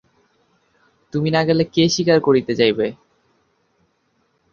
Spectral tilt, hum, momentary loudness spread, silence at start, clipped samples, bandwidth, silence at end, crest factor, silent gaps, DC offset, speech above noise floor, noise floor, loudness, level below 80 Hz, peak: -5.5 dB/octave; none; 8 LU; 1.15 s; under 0.1%; 7.2 kHz; 1.6 s; 18 dB; none; under 0.1%; 49 dB; -65 dBFS; -18 LUFS; -58 dBFS; -2 dBFS